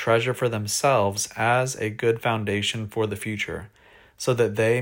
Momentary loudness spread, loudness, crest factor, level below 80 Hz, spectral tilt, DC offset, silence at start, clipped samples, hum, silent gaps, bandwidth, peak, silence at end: 7 LU; -24 LUFS; 16 dB; -58 dBFS; -4 dB/octave; under 0.1%; 0 s; under 0.1%; none; none; 16.5 kHz; -8 dBFS; 0 s